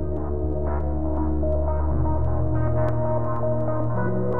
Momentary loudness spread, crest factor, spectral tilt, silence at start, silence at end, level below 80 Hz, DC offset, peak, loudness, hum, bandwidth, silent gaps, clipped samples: 3 LU; 12 dB; -12.5 dB/octave; 0 s; 0 s; -28 dBFS; 5%; -10 dBFS; -25 LUFS; none; 2.3 kHz; none; under 0.1%